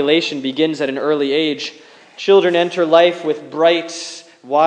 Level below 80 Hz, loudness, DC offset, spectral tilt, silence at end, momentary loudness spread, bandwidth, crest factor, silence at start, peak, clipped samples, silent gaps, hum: -82 dBFS; -16 LUFS; under 0.1%; -4 dB/octave; 0 s; 14 LU; 9.8 kHz; 16 dB; 0 s; 0 dBFS; under 0.1%; none; none